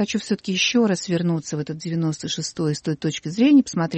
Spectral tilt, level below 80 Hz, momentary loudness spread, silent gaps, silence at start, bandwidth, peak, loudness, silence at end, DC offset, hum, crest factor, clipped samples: -5 dB/octave; -60 dBFS; 10 LU; none; 0 s; 8.8 kHz; -6 dBFS; -22 LUFS; 0 s; under 0.1%; none; 16 dB; under 0.1%